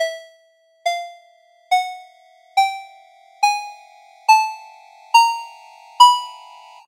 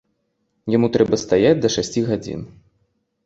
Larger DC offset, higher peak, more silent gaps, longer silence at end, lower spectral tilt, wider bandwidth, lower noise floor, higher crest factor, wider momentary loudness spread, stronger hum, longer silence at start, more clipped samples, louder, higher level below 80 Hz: neither; about the same, 0 dBFS vs -2 dBFS; neither; second, 0.5 s vs 0.8 s; second, 6.5 dB/octave vs -5.5 dB/octave; first, 16 kHz vs 8 kHz; second, -57 dBFS vs -70 dBFS; about the same, 20 dB vs 18 dB; first, 24 LU vs 15 LU; neither; second, 0 s vs 0.65 s; neither; about the same, -18 LUFS vs -18 LUFS; second, under -90 dBFS vs -50 dBFS